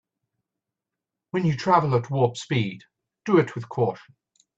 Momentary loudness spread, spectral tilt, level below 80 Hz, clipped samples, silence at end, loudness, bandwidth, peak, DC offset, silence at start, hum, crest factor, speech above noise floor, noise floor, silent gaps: 12 LU; -7 dB/octave; -64 dBFS; under 0.1%; 0.6 s; -24 LUFS; 8.2 kHz; -6 dBFS; under 0.1%; 1.35 s; none; 20 dB; 64 dB; -87 dBFS; none